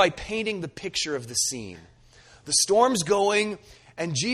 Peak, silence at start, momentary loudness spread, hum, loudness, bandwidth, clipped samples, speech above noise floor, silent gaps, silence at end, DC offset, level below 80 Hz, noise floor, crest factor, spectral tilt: -6 dBFS; 0 s; 15 LU; none; -24 LUFS; 14 kHz; under 0.1%; 28 dB; none; 0 s; under 0.1%; -54 dBFS; -53 dBFS; 20 dB; -2.5 dB/octave